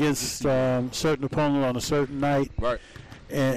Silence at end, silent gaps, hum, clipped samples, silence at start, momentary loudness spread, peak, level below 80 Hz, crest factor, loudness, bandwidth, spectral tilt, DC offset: 0 s; none; none; under 0.1%; 0 s; 9 LU; -18 dBFS; -44 dBFS; 6 dB; -26 LUFS; 15.5 kHz; -5 dB/octave; 0.3%